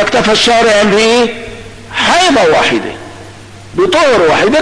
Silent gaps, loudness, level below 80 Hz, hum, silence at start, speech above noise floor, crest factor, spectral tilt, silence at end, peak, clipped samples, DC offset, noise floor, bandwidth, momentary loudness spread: none; -9 LUFS; -38 dBFS; none; 0 s; 23 dB; 8 dB; -3 dB/octave; 0 s; -2 dBFS; under 0.1%; under 0.1%; -32 dBFS; 11 kHz; 18 LU